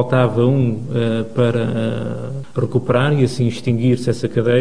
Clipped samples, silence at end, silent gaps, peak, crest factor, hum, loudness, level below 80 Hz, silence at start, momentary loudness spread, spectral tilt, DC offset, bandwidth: under 0.1%; 0 s; none; -2 dBFS; 16 dB; none; -18 LUFS; -52 dBFS; 0 s; 8 LU; -7.5 dB/octave; 2%; 10.5 kHz